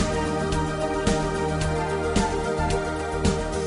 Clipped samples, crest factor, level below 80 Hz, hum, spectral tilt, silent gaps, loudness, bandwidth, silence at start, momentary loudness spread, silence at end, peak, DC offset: under 0.1%; 16 dB; -34 dBFS; none; -5.5 dB/octave; none; -25 LUFS; 11 kHz; 0 s; 2 LU; 0 s; -8 dBFS; under 0.1%